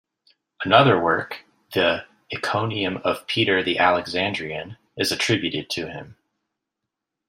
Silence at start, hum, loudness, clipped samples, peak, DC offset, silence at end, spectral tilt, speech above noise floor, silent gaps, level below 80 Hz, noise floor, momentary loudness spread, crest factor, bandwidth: 0.6 s; none; -21 LUFS; under 0.1%; -2 dBFS; under 0.1%; 1.15 s; -4.5 dB/octave; 61 dB; none; -62 dBFS; -83 dBFS; 16 LU; 22 dB; 15.5 kHz